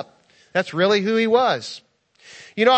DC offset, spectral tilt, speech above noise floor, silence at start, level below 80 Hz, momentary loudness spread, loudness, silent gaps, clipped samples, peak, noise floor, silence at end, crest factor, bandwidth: under 0.1%; -4.5 dB/octave; 35 dB; 0 s; -70 dBFS; 18 LU; -20 LUFS; none; under 0.1%; -2 dBFS; -54 dBFS; 0 s; 18 dB; 8.6 kHz